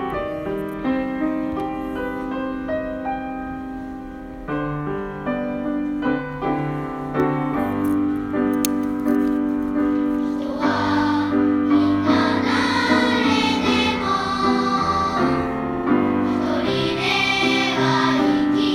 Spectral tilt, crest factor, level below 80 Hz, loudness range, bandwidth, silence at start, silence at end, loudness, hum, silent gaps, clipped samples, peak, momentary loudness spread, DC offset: -5 dB/octave; 20 dB; -44 dBFS; 9 LU; 16 kHz; 0 s; 0 s; -21 LUFS; none; none; under 0.1%; 0 dBFS; 9 LU; under 0.1%